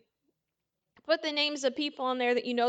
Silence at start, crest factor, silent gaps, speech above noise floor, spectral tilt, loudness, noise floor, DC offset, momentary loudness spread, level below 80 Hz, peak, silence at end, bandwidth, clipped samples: 1.05 s; 20 dB; none; 56 dB; -2 dB/octave; -30 LUFS; -86 dBFS; under 0.1%; 4 LU; -84 dBFS; -12 dBFS; 0 s; 9 kHz; under 0.1%